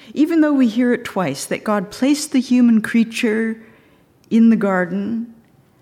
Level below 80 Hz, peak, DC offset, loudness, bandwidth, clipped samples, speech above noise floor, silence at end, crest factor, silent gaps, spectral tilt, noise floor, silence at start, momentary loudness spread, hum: -64 dBFS; -6 dBFS; under 0.1%; -17 LUFS; 14.5 kHz; under 0.1%; 36 dB; 0.5 s; 12 dB; none; -5.5 dB/octave; -53 dBFS; 0.05 s; 10 LU; none